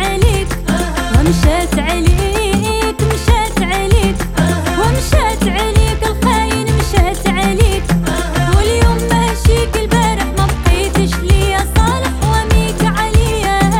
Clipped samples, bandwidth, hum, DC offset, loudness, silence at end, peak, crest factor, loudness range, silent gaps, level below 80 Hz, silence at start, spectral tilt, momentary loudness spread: under 0.1%; 17 kHz; none; under 0.1%; -14 LUFS; 0 s; 0 dBFS; 12 dB; 1 LU; none; -16 dBFS; 0 s; -5 dB/octave; 3 LU